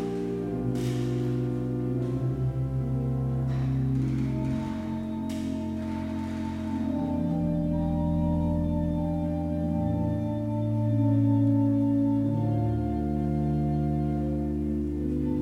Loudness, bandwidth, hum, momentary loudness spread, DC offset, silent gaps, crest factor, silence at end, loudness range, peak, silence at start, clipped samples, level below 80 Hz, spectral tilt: -28 LUFS; 11.5 kHz; none; 7 LU; under 0.1%; none; 12 dB; 0 s; 4 LU; -14 dBFS; 0 s; under 0.1%; -40 dBFS; -9.5 dB/octave